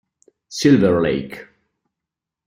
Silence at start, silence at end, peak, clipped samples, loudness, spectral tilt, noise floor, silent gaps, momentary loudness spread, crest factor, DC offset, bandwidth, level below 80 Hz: 0.5 s; 1.05 s; -2 dBFS; under 0.1%; -17 LUFS; -6 dB/octave; -85 dBFS; none; 20 LU; 18 dB; under 0.1%; 15.5 kHz; -52 dBFS